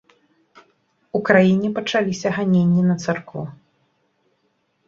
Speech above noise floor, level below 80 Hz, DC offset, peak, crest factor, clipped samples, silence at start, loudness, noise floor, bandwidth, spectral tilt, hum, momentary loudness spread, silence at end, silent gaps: 49 dB; -60 dBFS; under 0.1%; -2 dBFS; 20 dB; under 0.1%; 1.15 s; -19 LUFS; -68 dBFS; 7.6 kHz; -6.5 dB/octave; none; 14 LU; 1.35 s; none